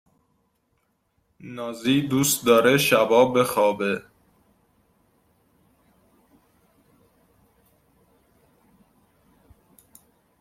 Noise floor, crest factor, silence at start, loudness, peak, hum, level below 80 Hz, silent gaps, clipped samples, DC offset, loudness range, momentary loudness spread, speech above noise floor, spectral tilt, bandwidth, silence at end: -71 dBFS; 22 dB; 1.45 s; -20 LUFS; -4 dBFS; none; -64 dBFS; none; under 0.1%; under 0.1%; 10 LU; 15 LU; 50 dB; -4 dB/octave; 16.5 kHz; 6.4 s